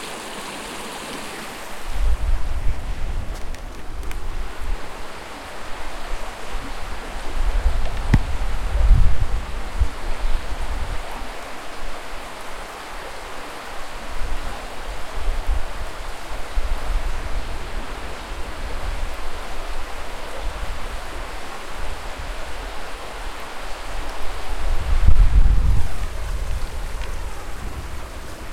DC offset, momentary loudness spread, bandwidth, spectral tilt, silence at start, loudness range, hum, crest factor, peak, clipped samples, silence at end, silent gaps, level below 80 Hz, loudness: under 0.1%; 12 LU; 13.5 kHz; -5 dB/octave; 0 s; 9 LU; none; 20 dB; 0 dBFS; under 0.1%; 0 s; none; -24 dBFS; -29 LUFS